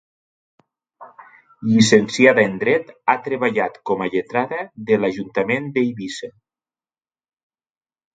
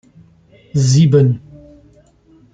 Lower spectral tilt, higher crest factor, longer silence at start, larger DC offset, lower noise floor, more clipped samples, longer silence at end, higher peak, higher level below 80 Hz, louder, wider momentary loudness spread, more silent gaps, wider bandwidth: second, -5 dB/octave vs -7 dB/octave; first, 20 dB vs 14 dB; first, 1 s vs 0.75 s; neither; first, under -90 dBFS vs -49 dBFS; neither; first, 1.85 s vs 1.15 s; about the same, 0 dBFS vs -2 dBFS; second, -60 dBFS vs -48 dBFS; second, -19 LUFS vs -14 LUFS; first, 15 LU vs 12 LU; neither; about the same, 9.2 kHz vs 9.2 kHz